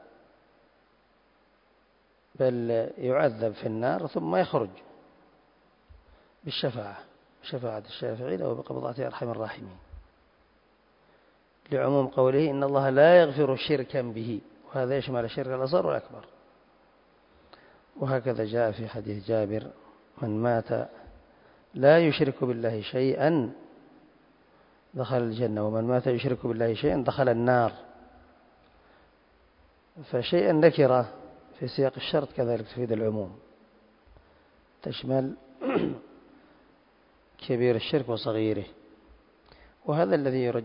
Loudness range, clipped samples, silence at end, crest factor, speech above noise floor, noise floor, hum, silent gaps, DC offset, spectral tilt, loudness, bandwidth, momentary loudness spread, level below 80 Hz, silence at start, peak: 10 LU; under 0.1%; 0 s; 22 dB; 39 dB; -65 dBFS; none; none; under 0.1%; -11 dB/octave; -27 LUFS; 5.4 kHz; 14 LU; -62 dBFS; 2.4 s; -6 dBFS